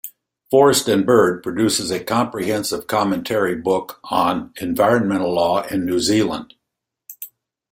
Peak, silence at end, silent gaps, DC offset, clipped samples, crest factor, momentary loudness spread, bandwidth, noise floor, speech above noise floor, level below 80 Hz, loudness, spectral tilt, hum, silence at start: -2 dBFS; 0.45 s; none; under 0.1%; under 0.1%; 18 dB; 11 LU; 16.5 kHz; -81 dBFS; 63 dB; -56 dBFS; -18 LUFS; -4.5 dB/octave; none; 0.05 s